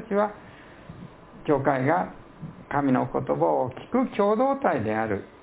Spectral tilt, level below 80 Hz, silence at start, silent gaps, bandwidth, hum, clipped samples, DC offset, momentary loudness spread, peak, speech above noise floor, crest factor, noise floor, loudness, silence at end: -11.5 dB/octave; -56 dBFS; 0 s; none; 4 kHz; none; under 0.1%; under 0.1%; 21 LU; -6 dBFS; 21 dB; 18 dB; -45 dBFS; -25 LUFS; 0.15 s